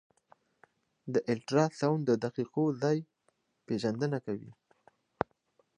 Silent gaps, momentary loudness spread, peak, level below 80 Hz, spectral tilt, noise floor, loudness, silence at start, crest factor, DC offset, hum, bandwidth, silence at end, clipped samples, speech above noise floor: none; 10 LU; -10 dBFS; -70 dBFS; -7 dB/octave; -75 dBFS; -32 LUFS; 1.05 s; 24 dB; under 0.1%; none; 10.5 kHz; 1.25 s; under 0.1%; 45 dB